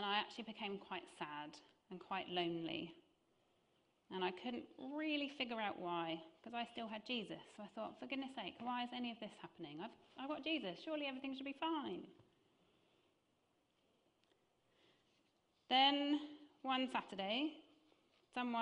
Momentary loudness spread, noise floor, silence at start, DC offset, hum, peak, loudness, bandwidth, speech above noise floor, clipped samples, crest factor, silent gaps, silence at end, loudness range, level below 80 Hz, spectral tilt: 13 LU; -81 dBFS; 0 s; under 0.1%; none; -22 dBFS; -43 LUFS; 10 kHz; 37 dB; under 0.1%; 24 dB; none; 0 s; 8 LU; -86 dBFS; -5 dB/octave